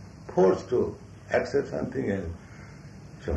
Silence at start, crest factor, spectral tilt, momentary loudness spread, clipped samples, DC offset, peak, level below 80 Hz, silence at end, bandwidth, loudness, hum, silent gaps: 0 s; 18 dB; -7.5 dB/octave; 22 LU; under 0.1%; under 0.1%; -10 dBFS; -50 dBFS; 0 s; 8.4 kHz; -27 LUFS; none; none